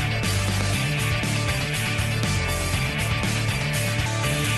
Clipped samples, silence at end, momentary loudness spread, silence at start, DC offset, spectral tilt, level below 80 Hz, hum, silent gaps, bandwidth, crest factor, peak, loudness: under 0.1%; 0 s; 1 LU; 0 s; under 0.1%; -4 dB/octave; -36 dBFS; none; none; 12.5 kHz; 16 dB; -8 dBFS; -24 LUFS